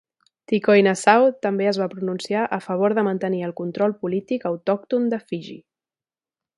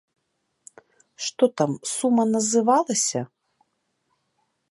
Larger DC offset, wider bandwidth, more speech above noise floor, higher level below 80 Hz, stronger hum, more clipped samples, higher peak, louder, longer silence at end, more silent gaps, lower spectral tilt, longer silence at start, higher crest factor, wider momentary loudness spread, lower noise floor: neither; about the same, 11.5 kHz vs 11.5 kHz; first, over 69 dB vs 53 dB; about the same, -72 dBFS vs -76 dBFS; neither; neither; first, 0 dBFS vs -6 dBFS; about the same, -21 LUFS vs -22 LUFS; second, 1 s vs 1.45 s; neither; first, -6 dB/octave vs -4 dB/octave; second, 0.5 s vs 1.2 s; about the same, 22 dB vs 20 dB; about the same, 12 LU vs 12 LU; first, under -90 dBFS vs -75 dBFS